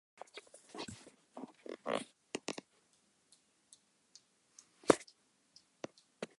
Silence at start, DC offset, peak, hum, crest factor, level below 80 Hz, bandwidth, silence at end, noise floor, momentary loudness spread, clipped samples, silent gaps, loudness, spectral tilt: 0.35 s; under 0.1%; -8 dBFS; none; 34 dB; -76 dBFS; 11.5 kHz; 0.15 s; -74 dBFS; 29 LU; under 0.1%; none; -40 LUFS; -3.5 dB/octave